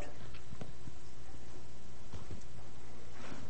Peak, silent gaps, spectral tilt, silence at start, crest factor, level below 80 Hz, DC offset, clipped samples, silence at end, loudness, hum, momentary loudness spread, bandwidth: -26 dBFS; none; -5 dB/octave; 0 s; 18 dB; -56 dBFS; 3%; under 0.1%; 0 s; -52 LUFS; none; 4 LU; 8.4 kHz